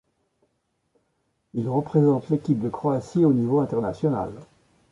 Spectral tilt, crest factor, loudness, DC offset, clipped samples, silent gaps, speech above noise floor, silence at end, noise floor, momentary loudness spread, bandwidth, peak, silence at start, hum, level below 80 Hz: -10 dB/octave; 16 dB; -23 LUFS; under 0.1%; under 0.1%; none; 51 dB; 0.45 s; -73 dBFS; 9 LU; 11 kHz; -8 dBFS; 1.55 s; none; -58 dBFS